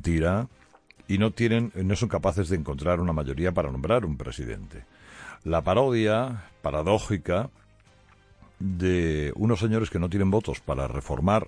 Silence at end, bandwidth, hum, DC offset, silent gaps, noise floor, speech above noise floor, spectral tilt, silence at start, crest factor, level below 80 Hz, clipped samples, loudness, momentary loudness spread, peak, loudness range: 0 s; 10.5 kHz; none; under 0.1%; none; -57 dBFS; 31 dB; -7 dB/octave; 0 s; 18 dB; -40 dBFS; under 0.1%; -26 LUFS; 11 LU; -8 dBFS; 2 LU